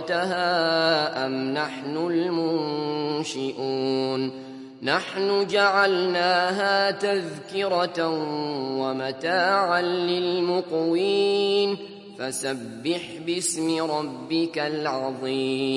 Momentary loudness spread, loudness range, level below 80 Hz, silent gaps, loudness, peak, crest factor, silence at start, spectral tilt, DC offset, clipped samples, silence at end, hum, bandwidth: 8 LU; 4 LU; -76 dBFS; none; -24 LUFS; -6 dBFS; 18 dB; 0 s; -4 dB/octave; under 0.1%; under 0.1%; 0 s; none; 11.5 kHz